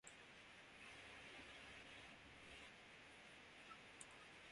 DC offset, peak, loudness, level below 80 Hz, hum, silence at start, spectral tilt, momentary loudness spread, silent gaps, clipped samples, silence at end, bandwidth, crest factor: under 0.1%; -38 dBFS; -60 LUFS; -80 dBFS; none; 0.05 s; -2 dB/octave; 4 LU; none; under 0.1%; 0 s; 11.5 kHz; 24 dB